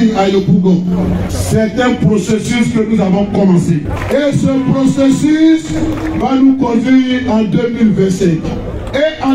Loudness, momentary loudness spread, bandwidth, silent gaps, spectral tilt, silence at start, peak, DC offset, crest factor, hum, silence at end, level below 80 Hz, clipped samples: -12 LUFS; 6 LU; 14 kHz; none; -6.5 dB/octave; 0 s; 0 dBFS; under 0.1%; 10 dB; none; 0 s; -30 dBFS; under 0.1%